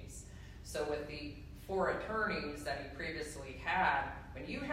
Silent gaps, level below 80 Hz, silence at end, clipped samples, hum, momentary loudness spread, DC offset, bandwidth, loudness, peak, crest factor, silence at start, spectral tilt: none; -54 dBFS; 0 s; under 0.1%; none; 16 LU; under 0.1%; 16 kHz; -38 LUFS; -20 dBFS; 18 dB; 0 s; -4.5 dB/octave